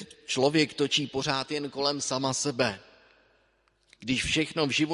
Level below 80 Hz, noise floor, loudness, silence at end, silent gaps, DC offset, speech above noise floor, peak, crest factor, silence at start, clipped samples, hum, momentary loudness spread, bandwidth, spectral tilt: -56 dBFS; -68 dBFS; -27 LUFS; 0 s; none; under 0.1%; 41 dB; -8 dBFS; 22 dB; 0 s; under 0.1%; none; 7 LU; 11.5 kHz; -3.5 dB/octave